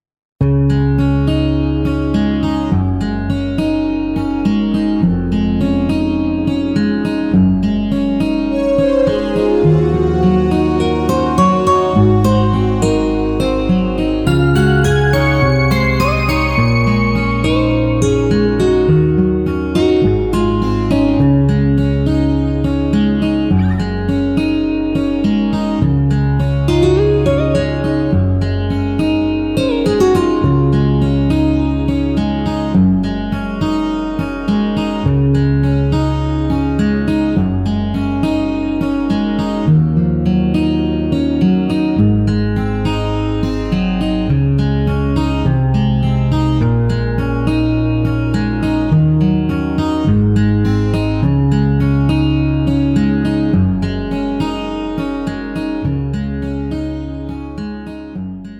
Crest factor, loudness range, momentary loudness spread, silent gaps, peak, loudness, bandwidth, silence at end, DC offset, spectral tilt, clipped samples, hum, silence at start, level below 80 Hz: 12 dB; 3 LU; 6 LU; none; -2 dBFS; -15 LUFS; 12.5 kHz; 0 s; under 0.1%; -8 dB/octave; under 0.1%; none; 0.4 s; -26 dBFS